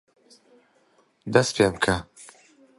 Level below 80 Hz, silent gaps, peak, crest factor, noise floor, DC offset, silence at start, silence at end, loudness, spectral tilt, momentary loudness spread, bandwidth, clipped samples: -50 dBFS; none; -2 dBFS; 24 dB; -63 dBFS; under 0.1%; 1.25 s; 0.55 s; -23 LUFS; -4.5 dB/octave; 20 LU; 11.5 kHz; under 0.1%